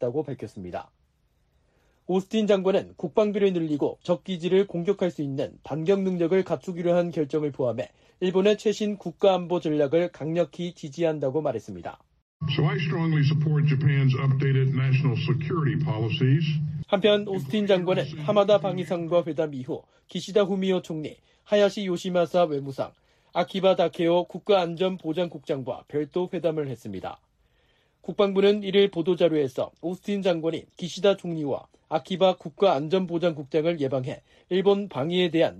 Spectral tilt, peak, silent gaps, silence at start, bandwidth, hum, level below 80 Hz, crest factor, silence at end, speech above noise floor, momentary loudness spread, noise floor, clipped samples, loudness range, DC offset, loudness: -7.5 dB/octave; -8 dBFS; 12.22-12.40 s; 0 s; 10 kHz; none; -64 dBFS; 16 dB; 0 s; 43 dB; 12 LU; -68 dBFS; under 0.1%; 4 LU; under 0.1%; -25 LUFS